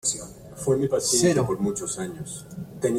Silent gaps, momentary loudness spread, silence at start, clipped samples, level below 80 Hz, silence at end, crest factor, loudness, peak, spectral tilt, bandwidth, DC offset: none; 16 LU; 0.05 s; under 0.1%; -54 dBFS; 0 s; 18 dB; -24 LUFS; -8 dBFS; -4 dB/octave; 16.5 kHz; under 0.1%